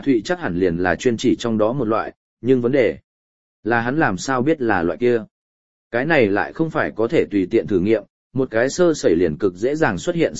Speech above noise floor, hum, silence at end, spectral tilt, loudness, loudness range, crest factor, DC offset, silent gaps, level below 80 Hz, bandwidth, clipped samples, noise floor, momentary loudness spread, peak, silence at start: over 72 dB; none; 0 s; -6 dB/octave; -19 LUFS; 1 LU; 18 dB; 0.9%; 2.16-2.37 s, 3.04-3.63 s, 5.31-5.90 s, 8.10-8.30 s; -50 dBFS; 8.2 kHz; under 0.1%; under -90 dBFS; 6 LU; -2 dBFS; 0 s